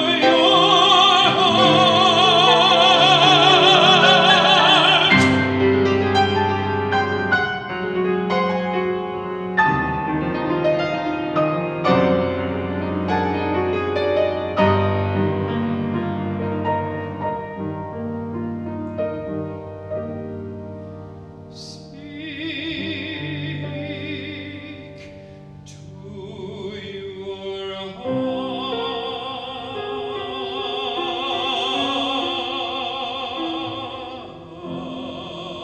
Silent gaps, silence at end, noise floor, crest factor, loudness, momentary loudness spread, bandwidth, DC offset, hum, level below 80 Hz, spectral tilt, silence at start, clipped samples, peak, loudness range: none; 0 s; -40 dBFS; 20 dB; -18 LUFS; 20 LU; 9.6 kHz; under 0.1%; none; -52 dBFS; -4.5 dB/octave; 0 s; under 0.1%; 0 dBFS; 18 LU